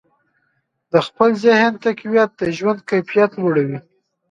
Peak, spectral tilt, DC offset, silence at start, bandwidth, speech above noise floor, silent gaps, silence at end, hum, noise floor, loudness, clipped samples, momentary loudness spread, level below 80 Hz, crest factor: 0 dBFS; -6.5 dB/octave; under 0.1%; 0.95 s; 7.8 kHz; 52 dB; none; 0.5 s; none; -68 dBFS; -17 LUFS; under 0.1%; 7 LU; -62 dBFS; 18 dB